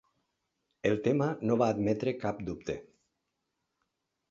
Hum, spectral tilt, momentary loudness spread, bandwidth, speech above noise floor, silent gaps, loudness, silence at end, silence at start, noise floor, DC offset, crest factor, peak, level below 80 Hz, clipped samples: none; -7.5 dB/octave; 10 LU; 7.6 kHz; 53 dB; none; -31 LUFS; 1.45 s; 0.85 s; -83 dBFS; under 0.1%; 20 dB; -12 dBFS; -62 dBFS; under 0.1%